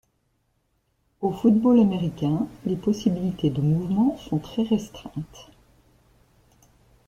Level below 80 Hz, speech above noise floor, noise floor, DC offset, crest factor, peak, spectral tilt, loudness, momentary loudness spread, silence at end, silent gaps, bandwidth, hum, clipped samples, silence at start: -54 dBFS; 48 dB; -70 dBFS; under 0.1%; 18 dB; -6 dBFS; -8.5 dB/octave; -23 LUFS; 15 LU; 1.65 s; none; 8.8 kHz; none; under 0.1%; 1.2 s